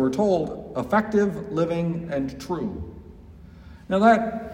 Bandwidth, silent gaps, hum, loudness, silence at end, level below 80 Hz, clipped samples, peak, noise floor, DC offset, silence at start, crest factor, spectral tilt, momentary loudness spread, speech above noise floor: 15.5 kHz; none; none; -24 LUFS; 0 s; -48 dBFS; under 0.1%; -4 dBFS; -45 dBFS; under 0.1%; 0 s; 20 dB; -7 dB/octave; 12 LU; 22 dB